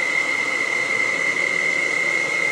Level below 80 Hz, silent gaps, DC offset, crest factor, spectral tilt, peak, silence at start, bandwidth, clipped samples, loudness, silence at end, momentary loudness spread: -72 dBFS; none; under 0.1%; 12 dB; -1.5 dB/octave; -8 dBFS; 0 s; 15 kHz; under 0.1%; -19 LUFS; 0 s; 1 LU